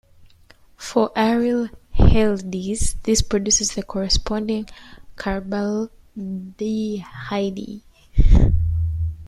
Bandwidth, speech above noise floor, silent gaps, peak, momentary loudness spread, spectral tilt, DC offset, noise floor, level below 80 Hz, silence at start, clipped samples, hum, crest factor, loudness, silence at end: 12.5 kHz; 31 dB; none; -2 dBFS; 14 LU; -5 dB/octave; under 0.1%; -50 dBFS; -24 dBFS; 0.8 s; under 0.1%; none; 18 dB; -22 LUFS; 0 s